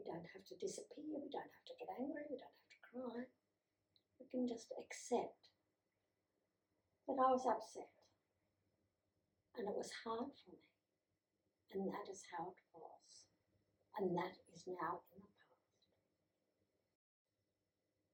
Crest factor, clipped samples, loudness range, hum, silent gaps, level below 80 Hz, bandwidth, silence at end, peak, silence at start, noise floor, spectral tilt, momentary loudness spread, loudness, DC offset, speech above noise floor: 24 dB; under 0.1%; 8 LU; none; none; under -90 dBFS; 18 kHz; 2.85 s; -24 dBFS; 0 s; under -90 dBFS; -5 dB/octave; 19 LU; -46 LUFS; under 0.1%; over 44 dB